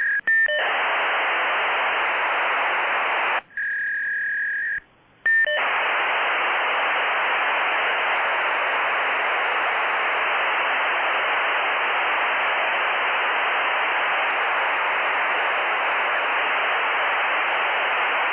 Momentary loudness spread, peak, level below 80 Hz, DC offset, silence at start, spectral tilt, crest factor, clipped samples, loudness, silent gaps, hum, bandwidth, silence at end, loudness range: 1 LU; -12 dBFS; -68 dBFS; under 0.1%; 0 s; 3.5 dB/octave; 10 dB; under 0.1%; -21 LUFS; none; none; 4 kHz; 0 s; 2 LU